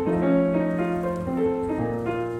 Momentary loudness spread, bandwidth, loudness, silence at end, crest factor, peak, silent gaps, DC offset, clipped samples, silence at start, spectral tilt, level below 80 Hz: 6 LU; 9.6 kHz; -24 LUFS; 0 s; 14 dB; -10 dBFS; none; under 0.1%; under 0.1%; 0 s; -9 dB/octave; -48 dBFS